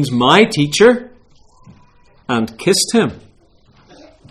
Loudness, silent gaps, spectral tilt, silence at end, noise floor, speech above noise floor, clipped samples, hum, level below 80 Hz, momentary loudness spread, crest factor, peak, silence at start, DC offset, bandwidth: -13 LUFS; none; -4 dB/octave; 1.15 s; -50 dBFS; 37 dB; under 0.1%; none; -50 dBFS; 11 LU; 16 dB; 0 dBFS; 0 s; under 0.1%; 15 kHz